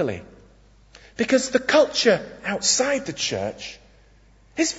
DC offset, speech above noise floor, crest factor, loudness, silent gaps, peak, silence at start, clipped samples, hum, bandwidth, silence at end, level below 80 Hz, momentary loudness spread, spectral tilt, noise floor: under 0.1%; 32 dB; 20 dB; -21 LUFS; none; -4 dBFS; 0 s; under 0.1%; none; 8 kHz; 0 s; -54 dBFS; 18 LU; -2.5 dB/octave; -54 dBFS